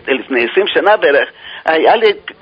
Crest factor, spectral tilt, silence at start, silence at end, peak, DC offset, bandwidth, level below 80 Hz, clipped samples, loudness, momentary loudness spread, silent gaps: 12 dB; -5.5 dB/octave; 0.05 s; 0.1 s; 0 dBFS; under 0.1%; 5.2 kHz; -58 dBFS; under 0.1%; -12 LUFS; 6 LU; none